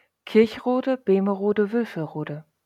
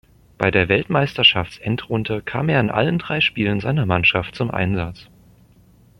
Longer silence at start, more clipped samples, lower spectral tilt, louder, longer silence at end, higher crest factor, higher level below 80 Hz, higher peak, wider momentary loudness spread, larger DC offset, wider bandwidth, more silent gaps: second, 0.25 s vs 0.4 s; neither; about the same, -8 dB/octave vs -7 dB/octave; second, -23 LUFS vs -19 LUFS; second, 0.25 s vs 0.95 s; about the same, 18 dB vs 20 dB; second, -68 dBFS vs -46 dBFS; second, -6 dBFS vs 0 dBFS; about the same, 11 LU vs 10 LU; neither; second, 13 kHz vs 15.5 kHz; neither